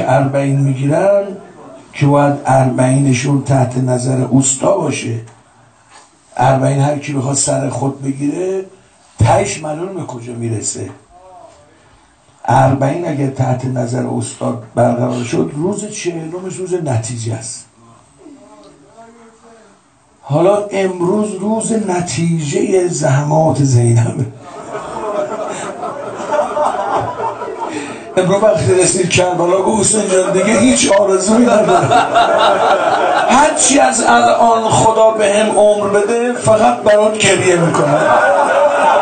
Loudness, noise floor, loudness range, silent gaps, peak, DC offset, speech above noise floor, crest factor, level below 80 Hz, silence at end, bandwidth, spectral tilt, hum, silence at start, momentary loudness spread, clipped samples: -13 LUFS; -50 dBFS; 9 LU; none; 0 dBFS; under 0.1%; 37 dB; 14 dB; -46 dBFS; 0 s; 9.2 kHz; -5 dB/octave; none; 0 s; 13 LU; under 0.1%